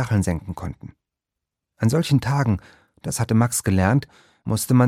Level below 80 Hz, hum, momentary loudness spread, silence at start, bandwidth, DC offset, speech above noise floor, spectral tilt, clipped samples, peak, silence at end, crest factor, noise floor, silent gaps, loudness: -46 dBFS; none; 14 LU; 0 s; 15.5 kHz; under 0.1%; 65 dB; -6 dB/octave; under 0.1%; -4 dBFS; 0 s; 18 dB; -85 dBFS; none; -22 LUFS